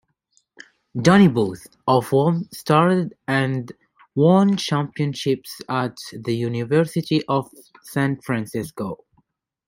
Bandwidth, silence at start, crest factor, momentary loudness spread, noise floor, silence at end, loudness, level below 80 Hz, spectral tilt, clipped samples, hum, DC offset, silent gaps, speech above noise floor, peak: 16.5 kHz; 0.95 s; 20 dB; 14 LU; -66 dBFS; 0.7 s; -21 LUFS; -58 dBFS; -6.5 dB/octave; under 0.1%; none; under 0.1%; none; 46 dB; -2 dBFS